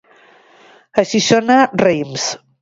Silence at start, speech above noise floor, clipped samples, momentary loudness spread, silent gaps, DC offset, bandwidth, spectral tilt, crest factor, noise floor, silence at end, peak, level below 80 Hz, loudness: 0.95 s; 34 dB; under 0.1%; 9 LU; none; under 0.1%; 7.8 kHz; -4 dB/octave; 16 dB; -48 dBFS; 0.25 s; 0 dBFS; -56 dBFS; -15 LUFS